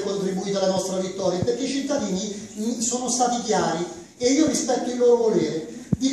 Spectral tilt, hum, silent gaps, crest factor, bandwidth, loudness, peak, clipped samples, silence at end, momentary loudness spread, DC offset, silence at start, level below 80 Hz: -4.5 dB/octave; none; none; 16 dB; 13.5 kHz; -23 LUFS; -6 dBFS; under 0.1%; 0 s; 9 LU; under 0.1%; 0 s; -56 dBFS